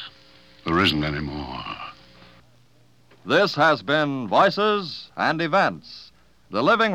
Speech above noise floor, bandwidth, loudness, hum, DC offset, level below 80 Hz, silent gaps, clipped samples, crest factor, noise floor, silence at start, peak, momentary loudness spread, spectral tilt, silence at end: 37 dB; 15 kHz; -22 LUFS; 60 Hz at -55 dBFS; 0.1%; -50 dBFS; none; under 0.1%; 18 dB; -58 dBFS; 0 s; -6 dBFS; 19 LU; -5.5 dB/octave; 0 s